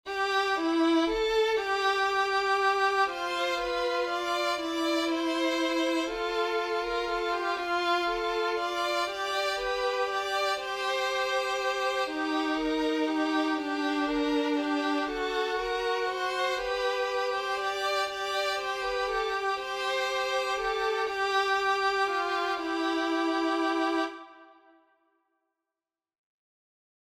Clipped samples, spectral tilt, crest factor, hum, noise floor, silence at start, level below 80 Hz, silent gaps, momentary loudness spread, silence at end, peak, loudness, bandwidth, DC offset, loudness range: under 0.1%; -2 dB/octave; 14 dB; none; under -90 dBFS; 0.05 s; -58 dBFS; none; 4 LU; 2.6 s; -14 dBFS; -28 LUFS; 16 kHz; under 0.1%; 3 LU